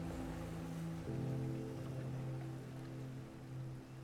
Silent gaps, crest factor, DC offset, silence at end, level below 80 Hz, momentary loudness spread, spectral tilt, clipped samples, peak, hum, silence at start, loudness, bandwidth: none; 12 dB; under 0.1%; 0 s; -60 dBFS; 7 LU; -7.5 dB/octave; under 0.1%; -32 dBFS; none; 0 s; -46 LUFS; 15.5 kHz